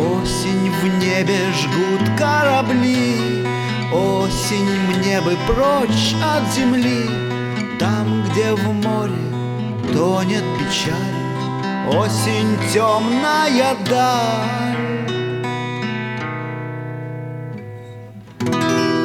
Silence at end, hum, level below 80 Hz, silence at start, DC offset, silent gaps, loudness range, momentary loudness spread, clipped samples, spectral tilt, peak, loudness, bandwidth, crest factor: 0 s; none; -40 dBFS; 0 s; under 0.1%; none; 6 LU; 10 LU; under 0.1%; -5 dB/octave; -4 dBFS; -18 LUFS; 17.5 kHz; 14 dB